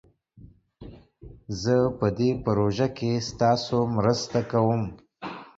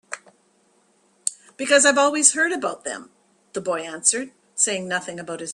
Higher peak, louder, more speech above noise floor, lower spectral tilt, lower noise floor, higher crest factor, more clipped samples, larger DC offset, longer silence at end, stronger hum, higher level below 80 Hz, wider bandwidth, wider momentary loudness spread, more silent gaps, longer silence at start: second, -8 dBFS vs -2 dBFS; second, -25 LUFS vs -20 LUFS; second, 28 dB vs 41 dB; first, -6.5 dB/octave vs -1 dB/octave; second, -52 dBFS vs -62 dBFS; about the same, 18 dB vs 22 dB; neither; neither; about the same, 0.1 s vs 0 s; neither; first, -50 dBFS vs -72 dBFS; second, 7.8 kHz vs 12.5 kHz; second, 13 LU vs 17 LU; neither; first, 0.4 s vs 0.1 s